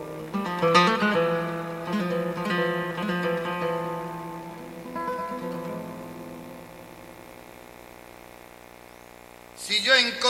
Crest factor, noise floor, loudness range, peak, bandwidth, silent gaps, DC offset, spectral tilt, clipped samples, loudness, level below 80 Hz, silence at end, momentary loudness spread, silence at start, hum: 24 dB; -47 dBFS; 19 LU; -4 dBFS; 16.5 kHz; none; under 0.1%; -4 dB/octave; under 0.1%; -26 LUFS; -60 dBFS; 0 s; 26 LU; 0 s; 60 Hz at -55 dBFS